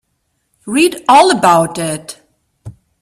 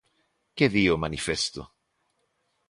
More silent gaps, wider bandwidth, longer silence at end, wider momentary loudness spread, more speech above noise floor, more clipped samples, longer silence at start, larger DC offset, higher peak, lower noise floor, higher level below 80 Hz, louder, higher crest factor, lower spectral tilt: neither; first, 14.5 kHz vs 11.5 kHz; second, 0.3 s vs 1.05 s; second, 14 LU vs 17 LU; first, 55 dB vs 49 dB; neither; about the same, 0.65 s vs 0.55 s; neither; first, 0 dBFS vs -6 dBFS; second, -66 dBFS vs -74 dBFS; about the same, -54 dBFS vs -50 dBFS; first, -11 LUFS vs -25 LUFS; second, 14 dB vs 22 dB; about the same, -4 dB/octave vs -4.5 dB/octave